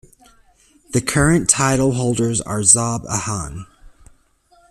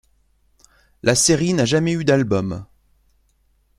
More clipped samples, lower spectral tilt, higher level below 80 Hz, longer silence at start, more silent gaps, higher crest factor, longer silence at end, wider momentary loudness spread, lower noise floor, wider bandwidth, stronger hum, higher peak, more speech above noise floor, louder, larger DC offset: neither; about the same, -4 dB/octave vs -4.5 dB/octave; first, -40 dBFS vs -50 dBFS; second, 0.9 s vs 1.05 s; neither; about the same, 20 dB vs 20 dB; second, 0.8 s vs 1.15 s; first, 13 LU vs 9 LU; second, -56 dBFS vs -62 dBFS; about the same, 14.5 kHz vs 14 kHz; neither; about the same, 0 dBFS vs -2 dBFS; second, 38 dB vs 44 dB; about the same, -16 LUFS vs -18 LUFS; neither